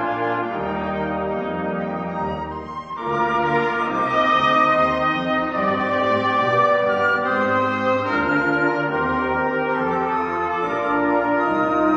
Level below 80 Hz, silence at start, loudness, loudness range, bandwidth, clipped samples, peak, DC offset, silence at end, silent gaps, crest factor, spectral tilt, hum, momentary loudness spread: -48 dBFS; 0 s; -20 LUFS; 5 LU; 8.8 kHz; under 0.1%; -6 dBFS; under 0.1%; 0 s; none; 14 dB; -6.5 dB/octave; none; 8 LU